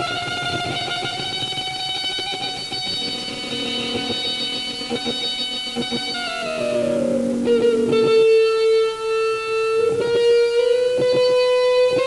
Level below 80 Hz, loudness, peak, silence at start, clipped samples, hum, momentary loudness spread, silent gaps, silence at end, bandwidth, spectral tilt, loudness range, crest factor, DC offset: -54 dBFS; -20 LUFS; -8 dBFS; 0 s; under 0.1%; none; 8 LU; none; 0 s; 12 kHz; -3.5 dB/octave; 5 LU; 12 dB; under 0.1%